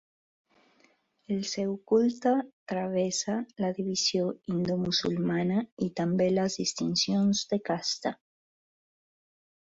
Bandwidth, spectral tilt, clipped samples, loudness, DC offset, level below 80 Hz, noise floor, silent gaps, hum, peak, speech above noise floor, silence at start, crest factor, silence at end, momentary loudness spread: 8 kHz; -4.5 dB/octave; under 0.1%; -29 LUFS; under 0.1%; -68 dBFS; -67 dBFS; 2.53-2.66 s, 5.72-5.77 s; none; -14 dBFS; 38 dB; 1.3 s; 16 dB; 1.5 s; 7 LU